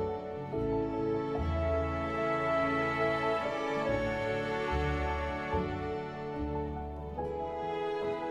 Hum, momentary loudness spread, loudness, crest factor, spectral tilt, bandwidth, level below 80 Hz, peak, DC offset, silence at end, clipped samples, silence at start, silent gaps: none; 8 LU; -33 LUFS; 14 dB; -7 dB/octave; 12 kHz; -44 dBFS; -20 dBFS; under 0.1%; 0 s; under 0.1%; 0 s; none